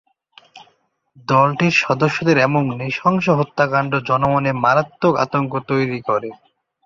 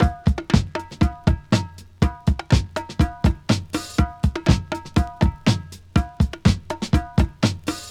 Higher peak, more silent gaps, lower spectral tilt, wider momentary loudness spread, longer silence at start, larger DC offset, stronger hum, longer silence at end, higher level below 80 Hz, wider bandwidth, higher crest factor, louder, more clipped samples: about the same, -2 dBFS vs -2 dBFS; neither; about the same, -6.5 dB/octave vs -6.5 dB/octave; about the same, 6 LU vs 5 LU; first, 0.55 s vs 0 s; neither; neither; first, 0.5 s vs 0 s; second, -56 dBFS vs -26 dBFS; second, 7.6 kHz vs 14.5 kHz; about the same, 16 dB vs 20 dB; first, -17 LUFS vs -22 LUFS; neither